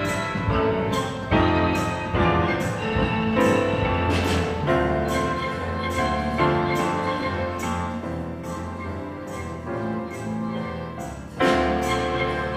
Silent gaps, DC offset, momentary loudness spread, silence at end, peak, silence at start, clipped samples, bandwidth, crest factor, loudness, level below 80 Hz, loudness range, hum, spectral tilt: none; under 0.1%; 11 LU; 0 s; -6 dBFS; 0 s; under 0.1%; 15.5 kHz; 16 dB; -24 LUFS; -38 dBFS; 8 LU; none; -6 dB/octave